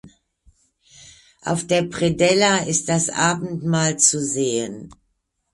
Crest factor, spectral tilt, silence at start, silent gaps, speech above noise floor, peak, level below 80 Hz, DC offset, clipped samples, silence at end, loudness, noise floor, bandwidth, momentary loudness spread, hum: 22 dB; -3.5 dB/octave; 0.05 s; none; 52 dB; 0 dBFS; -54 dBFS; under 0.1%; under 0.1%; 0.6 s; -19 LUFS; -71 dBFS; 11.5 kHz; 10 LU; none